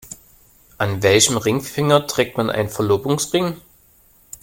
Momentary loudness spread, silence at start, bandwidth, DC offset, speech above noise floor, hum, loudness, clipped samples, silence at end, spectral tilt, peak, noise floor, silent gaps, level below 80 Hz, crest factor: 20 LU; 0.05 s; 17 kHz; under 0.1%; 35 dB; none; -18 LUFS; under 0.1%; 0.85 s; -4 dB/octave; 0 dBFS; -53 dBFS; none; -52 dBFS; 20 dB